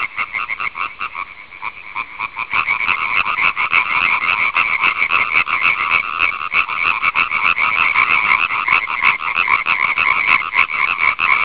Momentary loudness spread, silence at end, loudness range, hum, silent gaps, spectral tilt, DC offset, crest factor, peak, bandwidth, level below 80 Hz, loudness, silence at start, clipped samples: 11 LU; 0 s; 4 LU; none; none; -4.5 dB/octave; 0.5%; 16 dB; 0 dBFS; 4 kHz; -50 dBFS; -14 LUFS; 0 s; under 0.1%